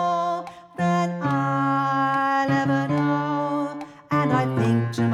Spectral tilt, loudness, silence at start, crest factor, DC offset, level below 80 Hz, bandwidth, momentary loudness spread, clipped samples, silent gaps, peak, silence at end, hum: -7.5 dB/octave; -23 LUFS; 0 s; 14 dB; under 0.1%; -66 dBFS; 12 kHz; 6 LU; under 0.1%; none; -8 dBFS; 0 s; none